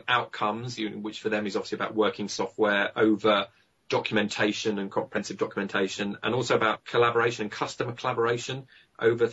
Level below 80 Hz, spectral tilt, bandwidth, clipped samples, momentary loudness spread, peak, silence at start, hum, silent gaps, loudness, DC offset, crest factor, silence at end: -68 dBFS; -4.5 dB/octave; 8 kHz; under 0.1%; 8 LU; -8 dBFS; 0.05 s; none; none; -27 LUFS; under 0.1%; 18 dB; 0 s